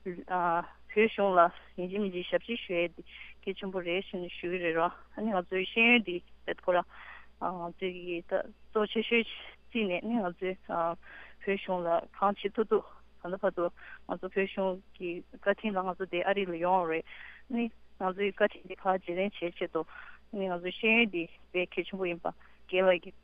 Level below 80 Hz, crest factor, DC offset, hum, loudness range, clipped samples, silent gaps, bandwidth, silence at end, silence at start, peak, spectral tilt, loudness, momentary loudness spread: -64 dBFS; 22 dB; under 0.1%; none; 4 LU; under 0.1%; none; 5 kHz; 0.05 s; 0 s; -10 dBFS; -7.5 dB/octave; -32 LUFS; 14 LU